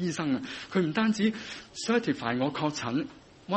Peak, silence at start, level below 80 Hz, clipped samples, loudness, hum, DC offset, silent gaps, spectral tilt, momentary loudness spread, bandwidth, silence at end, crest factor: -12 dBFS; 0 s; -64 dBFS; under 0.1%; -29 LUFS; none; under 0.1%; none; -5 dB/octave; 12 LU; 8.4 kHz; 0 s; 18 dB